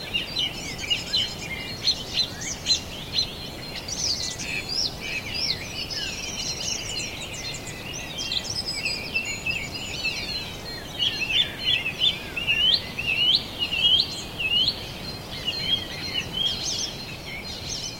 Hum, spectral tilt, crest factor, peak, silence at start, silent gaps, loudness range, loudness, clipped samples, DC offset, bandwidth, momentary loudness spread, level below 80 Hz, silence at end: none; -1.5 dB/octave; 20 dB; -8 dBFS; 0 s; none; 7 LU; -25 LUFS; under 0.1%; under 0.1%; 16.5 kHz; 12 LU; -46 dBFS; 0 s